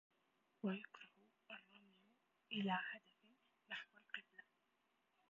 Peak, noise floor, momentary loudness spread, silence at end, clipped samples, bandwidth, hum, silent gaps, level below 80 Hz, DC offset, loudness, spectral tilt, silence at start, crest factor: -28 dBFS; -84 dBFS; 22 LU; 0.9 s; under 0.1%; 7.2 kHz; none; none; under -90 dBFS; under 0.1%; -49 LUFS; -3 dB/octave; 0.65 s; 24 dB